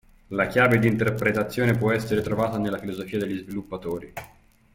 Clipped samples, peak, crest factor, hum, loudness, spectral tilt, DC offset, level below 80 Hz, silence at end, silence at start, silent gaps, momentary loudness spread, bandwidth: under 0.1%; -6 dBFS; 18 dB; none; -24 LUFS; -7 dB/octave; under 0.1%; -52 dBFS; 0.5 s; 0.3 s; none; 13 LU; 16.5 kHz